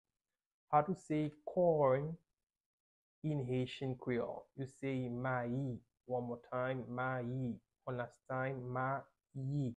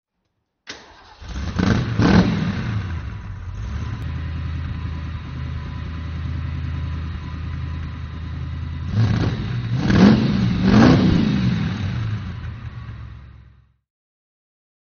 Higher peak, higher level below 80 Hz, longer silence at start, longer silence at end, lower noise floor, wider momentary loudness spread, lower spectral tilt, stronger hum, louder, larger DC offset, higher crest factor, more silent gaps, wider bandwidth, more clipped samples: second, -18 dBFS vs 0 dBFS; second, -70 dBFS vs -32 dBFS; about the same, 0.7 s vs 0.65 s; second, 0.05 s vs 1.4 s; first, under -90 dBFS vs -74 dBFS; second, 12 LU vs 19 LU; first, -8 dB/octave vs -6.5 dB/octave; neither; second, -39 LUFS vs -21 LUFS; neither; about the same, 22 dB vs 22 dB; first, 2.43-2.47 s, 2.60-3.22 s vs none; first, 10 kHz vs 6.8 kHz; neither